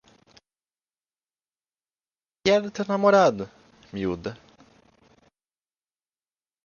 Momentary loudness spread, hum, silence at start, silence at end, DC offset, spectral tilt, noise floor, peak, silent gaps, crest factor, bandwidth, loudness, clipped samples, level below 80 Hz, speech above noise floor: 19 LU; none; 2.45 s; 2.3 s; under 0.1%; -5.5 dB/octave; under -90 dBFS; -6 dBFS; none; 22 dB; 7.2 kHz; -23 LUFS; under 0.1%; -60 dBFS; over 68 dB